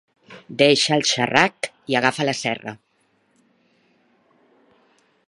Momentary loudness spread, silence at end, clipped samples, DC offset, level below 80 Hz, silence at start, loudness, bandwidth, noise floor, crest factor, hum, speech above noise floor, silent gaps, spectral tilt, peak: 15 LU; 2.55 s; under 0.1%; under 0.1%; -66 dBFS; 0.3 s; -19 LUFS; 11.5 kHz; -65 dBFS; 24 dB; none; 45 dB; none; -3 dB/octave; 0 dBFS